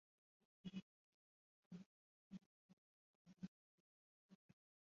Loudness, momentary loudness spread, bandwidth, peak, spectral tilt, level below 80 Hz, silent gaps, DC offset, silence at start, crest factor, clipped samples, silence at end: -60 LUFS; 7 LU; 7.2 kHz; -40 dBFS; -7 dB/octave; under -90 dBFS; 0.82-1.71 s, 1.86-2.31 s, 2.46-3.25 s, 3.48-4.29 s, 4.35-4.49 s; under 0.1%; 0.65 s; 22 dB; under 0.1%; 0.35 s